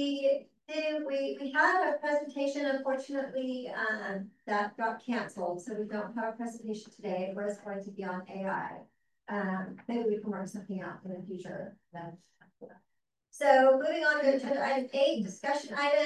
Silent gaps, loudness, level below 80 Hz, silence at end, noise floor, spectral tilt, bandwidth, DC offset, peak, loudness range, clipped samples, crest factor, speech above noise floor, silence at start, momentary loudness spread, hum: none; -32 LUFS; -82 dBFS; 0 s; -59 dBFS; -5 dB/octave; 11.5 kHz; under 0.1%; -10 dBFS; 9 LU; under 0.1%; 22 dB; 28 dB; 0 s; 15 LU; none